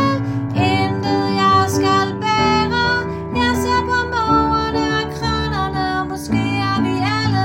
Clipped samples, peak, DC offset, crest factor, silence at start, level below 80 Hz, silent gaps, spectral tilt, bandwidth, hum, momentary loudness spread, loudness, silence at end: under 0.1%; -2 dBFS; under 0.1%; 16 dB; 0 s; -38 dBFS; none; -5.5 dB/octave; 16.5 kHz; none; 6 LU; -17 LUFS; 0 s